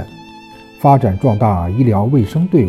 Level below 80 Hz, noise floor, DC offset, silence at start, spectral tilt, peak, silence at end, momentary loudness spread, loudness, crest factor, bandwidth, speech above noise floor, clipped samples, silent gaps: -44 dBFS; -37 dBFS; under 0.1%; 0 s; -10 dB/octave; 0 dBFS; 0 s; 4 LU; -14 LUFS; 14 dB; 13.5 kHz; 25 dB; under 0.1%; none